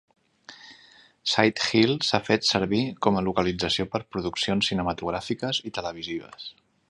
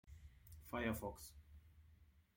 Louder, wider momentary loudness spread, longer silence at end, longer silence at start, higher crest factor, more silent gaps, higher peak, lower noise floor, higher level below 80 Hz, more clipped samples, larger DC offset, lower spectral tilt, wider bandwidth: first, -25 LUFS vs -47 LUFS; second, 13 LU vs 25 LU; first, 0.4 s vs 0.15 s; first, 0.5 s vs 0.05 s; about the same, 24 dB vs 22 dB; neither; first, -2 dBFS vs -28 dBFS; second, -55 dBFS vs -69 dBFS; first, -52 dBFS vs -62 dBFS; neither; neither; about the same, -4.5 dB/octave vs -5.5 dB/octave; second, 11.5 kHz vs 16.5 kHz